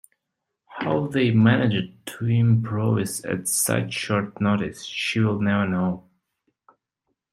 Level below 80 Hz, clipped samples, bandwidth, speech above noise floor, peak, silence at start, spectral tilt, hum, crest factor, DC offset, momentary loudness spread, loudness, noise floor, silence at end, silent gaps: -62 dBFS; under 0.1%; 14 kHz; 60 dB; -4 dBFS; 0.7 s; -5.5 dB/octave; none; 20 dB; under 0.1%; 10 LU; -23 LUFS; -82 dBFS; 1.3 s; none